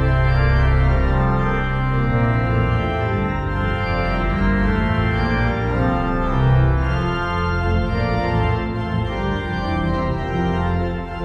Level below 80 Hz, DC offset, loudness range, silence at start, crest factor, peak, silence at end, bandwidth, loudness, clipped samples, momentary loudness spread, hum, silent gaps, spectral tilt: -24 dBFS; under 0.1%; 2 LU; 0 s; 12 dB; -6 dBFS; 0 s; 6.6 kHz; -20 LUFS; under 0.1%; 5 LU; none; none; -8.5 dB/octave